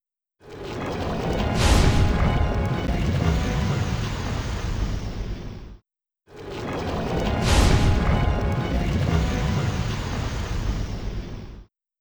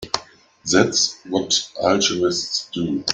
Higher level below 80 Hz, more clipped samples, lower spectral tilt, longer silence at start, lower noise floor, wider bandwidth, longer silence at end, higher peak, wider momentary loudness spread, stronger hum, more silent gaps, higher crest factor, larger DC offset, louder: first, -28 dBFS vs -56 dBFS; neither; first, -6 dB/octave vs -2.5 dB/octave; first, 0.45 s vs 0 s; first, -68 dBFS vs -44 dBFS; first, over 20 kHz vs 10 kHz; first, 0.35 s vs 0 s; second, -6 dBFS vs -2 dBFS; first, 15 LU vs 9 LU; neither; neither; about the same, 18 dB vs 20 dB; neither; second, -24 LUFS vs -20 LUFS